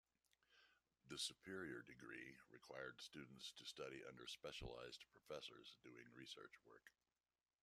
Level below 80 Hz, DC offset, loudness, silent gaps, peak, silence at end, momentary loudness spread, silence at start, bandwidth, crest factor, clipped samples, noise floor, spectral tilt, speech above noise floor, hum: -76 dBFS; under 0.1%; -56 LUFS; none; -36 dBFS; 0.7 s; 14 LU; 0.5 s; 14 kHz; 24 dB; under 0.1%; under -90 dBFS; -2.5 dB/octave; over 33 dB; none